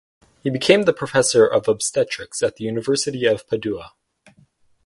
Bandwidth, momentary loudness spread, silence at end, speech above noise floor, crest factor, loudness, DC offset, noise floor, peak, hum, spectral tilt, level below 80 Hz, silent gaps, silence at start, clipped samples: 11.5 kHz; 10 LU; 1 s; 38 dB; 20 dB; -19 LUFS; under 0.1%; -57 dBFS; 0 dBFS; none; -3.5 dB/octave; -58 dBFS; none; 0.45 s; under 0.1%